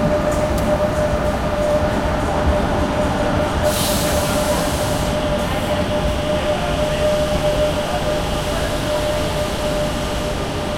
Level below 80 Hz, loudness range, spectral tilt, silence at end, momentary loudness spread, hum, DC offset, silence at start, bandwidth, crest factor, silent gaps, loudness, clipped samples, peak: -28 dBFS; 1 LU; -5 dB/octave; 0 s; 3 LU; none; under 0.1%; 0 s; 16.5 kHz; 14 dB; none; -19 LUFS; under 0.1%; -6 dBFS